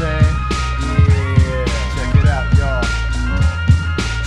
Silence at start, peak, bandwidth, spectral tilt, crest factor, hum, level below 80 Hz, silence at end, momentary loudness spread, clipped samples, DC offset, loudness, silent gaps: 0 s; 0 dBFS; 11 kHz; -6 dB/octave; 14 dB; none; -20 dBFS; 0 s; 6 LU; under 0.1%; under 0.1%; -16 LUFS; none